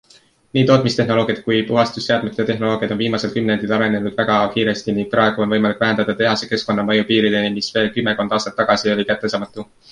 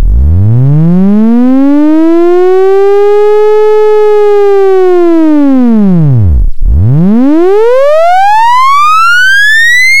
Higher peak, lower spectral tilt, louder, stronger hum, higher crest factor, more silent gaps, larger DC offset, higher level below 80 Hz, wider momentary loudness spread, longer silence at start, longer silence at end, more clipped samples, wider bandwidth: about the same, -2 dBFS vs 0 dBFS; about the same, -5.5 dB/octave vs -6.5 dB/octave; second, -18 LUFS vs -5 LUFS; neither; first, 16 dB vs 6 dB; neither; second, under 0.1% vs 30%; second, -54 dBFS vs -16 dBFS; about the same, 5 LU vs 3 LU; first, 0.55 s vs 0 s; first, 0.25 s vs 0 s; second, under 0.1% vs 4%; second, 10.5 kHz vs 16 kHz